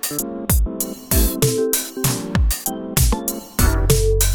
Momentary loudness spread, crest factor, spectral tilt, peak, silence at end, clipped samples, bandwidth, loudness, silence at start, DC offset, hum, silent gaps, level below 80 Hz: 7 LU; 16 dB; -4 dB/octave; -2 dBFS; 0 s; under 0.1%; 19.5 kHz; -19 LUFS; 0 s; under 0.1%; none; none; -22 dBFS